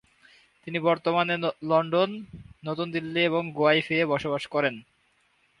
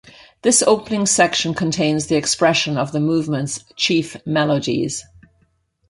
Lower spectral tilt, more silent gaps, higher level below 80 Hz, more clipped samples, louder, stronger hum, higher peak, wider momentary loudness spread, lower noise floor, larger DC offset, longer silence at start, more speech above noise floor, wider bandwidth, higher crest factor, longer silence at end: first, -6.5 dB/octave vs -3.5 dB/octave; neither; second, -64 dBFS vs -54 dBFS; neither; second, -26 LUFS vs -18 LUFS; neither; second, -8 dBFS vs -2 dBFS; first, 15 LU vs 8 LU; first, -67 dBFS vs -62 dBFS; neither; first, 0.65 s vs 0.05 s; about the same, 42 dB vs 44 dB; about the same, 11 kHz vs 11.5 kHz; about the same, 20 dB vs 18 dB; about the same, 0.8 s vs 0.85 s